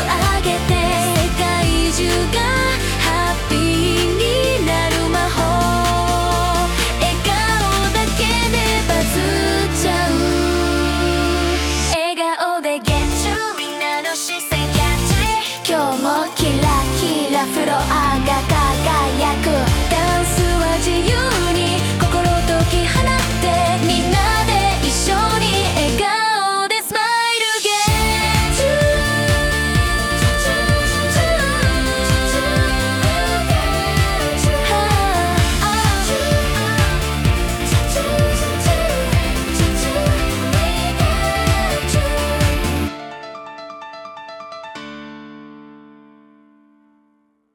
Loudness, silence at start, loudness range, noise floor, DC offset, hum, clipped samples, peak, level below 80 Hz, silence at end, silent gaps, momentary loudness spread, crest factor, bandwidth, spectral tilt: -17 LUFS; 0 s; 3 LU; -61 dBFS; under 0.1%; none; under 0.1%; -4 dBFS; -24 dBFS; 1.75 s; none; 4 LU; 14 dB; 18 kHz; -4 dB/octave